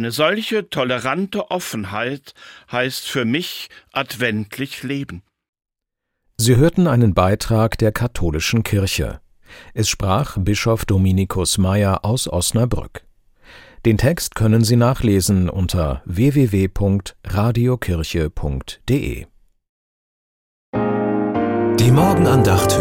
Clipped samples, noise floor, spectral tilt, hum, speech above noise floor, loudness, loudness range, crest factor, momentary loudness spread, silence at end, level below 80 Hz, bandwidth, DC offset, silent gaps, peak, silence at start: under 0.1%; -79 dBFS; -5.5 dB/octave; none; 61 dB; -18 LUFS; 6 LU; 16 dB; 12 LU; 0 s; -36 dBFS; 17 kHz; under 0.1%; 5.49-5.53 s, 19.69-20.73 s; -2 dBFS; 0 s